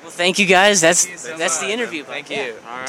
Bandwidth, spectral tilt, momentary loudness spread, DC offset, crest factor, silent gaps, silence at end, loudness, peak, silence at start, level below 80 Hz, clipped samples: 20 kHz; -1.5 dB/octave; 14 LU; under 0.1%; 18 dB; none; 0 s; -16 LUFS; 0 dBFS; 0 s; -66 dBFS; under 0.1%